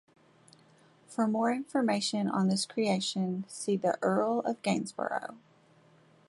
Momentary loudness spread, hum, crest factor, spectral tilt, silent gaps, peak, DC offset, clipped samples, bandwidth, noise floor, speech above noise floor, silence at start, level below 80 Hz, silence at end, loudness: 6 LU; none; 16 dB; -5 dB/octave; none; -14 dBFS; under 0.1%; under 0.1%; 11.5 kHz; -62 dBFS; 32 dB; 1.1 s; -76 dBFS; 0.9 s; -31 LUFS